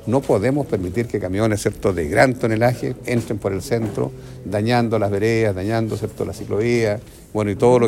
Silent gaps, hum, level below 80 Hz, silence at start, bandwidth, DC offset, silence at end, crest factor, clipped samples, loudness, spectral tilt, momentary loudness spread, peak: none; none; -44 dBFS; 0 s; 16 kHz; under 0.1%; 0 s; 18 dB; under 0.1%; -20 LUFS; -6.5 dB/octave; 9 LU; 0 dBFS